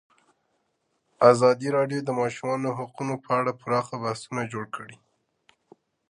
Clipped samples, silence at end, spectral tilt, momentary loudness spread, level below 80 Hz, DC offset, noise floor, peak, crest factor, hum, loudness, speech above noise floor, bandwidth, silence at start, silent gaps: under 0.1%; 1.15 s; -6 dB/octave; 14 LU; -72 dBFS; under 0.1%; -74 dBFS; -2 dBFS; 24 dB; none; -25 LUFS; 49 dB; 11 kHz; 1.2 s; none